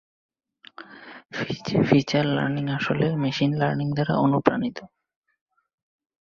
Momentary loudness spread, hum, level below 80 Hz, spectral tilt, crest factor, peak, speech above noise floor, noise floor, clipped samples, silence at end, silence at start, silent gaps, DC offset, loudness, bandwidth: 22 LU; none; -58 dBFS; -7 dB/octave; 24 dB; -2 dBFS; 23 dB; -46 dBFS; under 0.1%; 1.45 s; 0.8 s; none; under 0.1%; -23 LUFS; 7.2 kHz